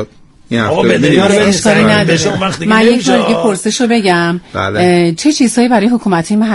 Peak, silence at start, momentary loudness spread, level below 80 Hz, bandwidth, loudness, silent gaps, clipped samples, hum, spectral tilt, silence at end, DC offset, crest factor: 0 dBFS; 0 s; 6 LU; -44 dBFS; 12 kHz; -10 LUFS; none; under 0.1%; none; -5 dB/octave; 0 s; under 0.1%; 10 dB